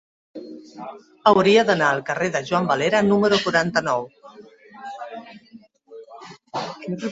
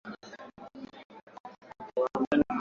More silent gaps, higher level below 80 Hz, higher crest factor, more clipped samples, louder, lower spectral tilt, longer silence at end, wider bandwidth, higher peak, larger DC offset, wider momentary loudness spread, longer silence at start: second, none vs 1.05-1.10 s, 1.23-1.27 s, 1.40-1.44 s, 2.27-2.31 s; about the same, -62 dBFS vs -64 dBFS; about the same, 20 dB vs 20 dB; neither; first, -20 LUFS vs -30 LUFS; second, -5 dB/octave vs -7 dB/octave; about the same, 0 s vs 0 s; first, 8 kHz vs 7.2 kHz; first, -2 dBFS vs -12 dBFS; neither; about the same, 23 LU vs 22 LU; first, 0.35 s vs 0.05 s